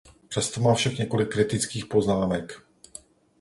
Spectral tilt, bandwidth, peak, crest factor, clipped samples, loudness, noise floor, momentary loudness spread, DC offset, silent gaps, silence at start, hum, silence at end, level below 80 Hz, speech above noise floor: -5 dB/octave; 11.5 kHz; -8 dBFS; 18 dB; under 0.1%; -25 LUFS; -49 dBFS; 22 LU; under 0.1%; none; 0.3 s; none; 0.8 s; -52 dBFS; 25 dB